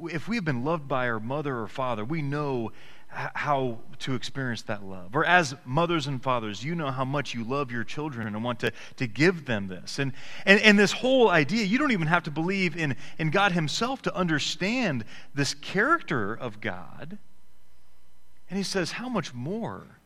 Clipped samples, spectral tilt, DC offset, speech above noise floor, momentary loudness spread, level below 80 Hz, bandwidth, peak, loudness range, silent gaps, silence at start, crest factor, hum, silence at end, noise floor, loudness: under 0.1%; -5 dB/octave; 1%; 37 dB; 13 LU; -56 dBFS; 14.5 kHz; 0 dBFS; 9 LU; none; 0 s; 26 dB; none; 0 s; -64 dBFS; -27 LUFS